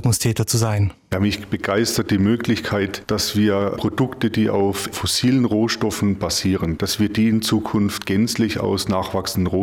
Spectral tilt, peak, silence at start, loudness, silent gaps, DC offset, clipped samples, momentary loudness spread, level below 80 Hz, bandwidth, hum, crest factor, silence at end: -5 dB/octave; -6 dBFS; 0 s; -20 LUFS; none; under 0.1%; under 0.1%; 4 LU; -46 dBFS; 17.5 kHz; none; 14 dB; 0 s